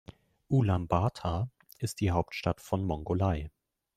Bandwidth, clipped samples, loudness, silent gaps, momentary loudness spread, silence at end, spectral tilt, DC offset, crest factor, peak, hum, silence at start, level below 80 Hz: 15 kHz; under 0.1%; -31 LUFS; none; 10 LU; 0.5 s; -7 dB/octave; under 0.1%; 20 dB; -10 dBFS; none; 0.5 s; -50 dBFS